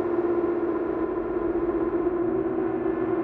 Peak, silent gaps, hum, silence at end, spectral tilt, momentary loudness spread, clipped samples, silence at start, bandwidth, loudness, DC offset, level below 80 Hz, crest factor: -14 dBFS; none; none; 0 s; -10.5 dB/octave; 2 LU; under 0.1%; 0 s; 3.6 kHz; -26 LUFS; under 0.1%; -50 dBFS; 12 dB